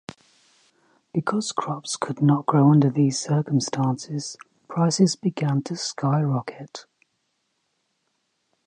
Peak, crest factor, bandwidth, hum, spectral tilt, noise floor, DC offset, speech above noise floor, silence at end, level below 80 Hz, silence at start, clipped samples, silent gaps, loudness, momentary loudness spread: -6 dBFS; 18 dB; 10.5 kHz; none; -6 dB/octave; -74 dBFS; under 0.1%; 51 dB; 1.85 s; -70 dBFS; 1.15 s; under 0.1%; none; -23 LUFS; 17 LU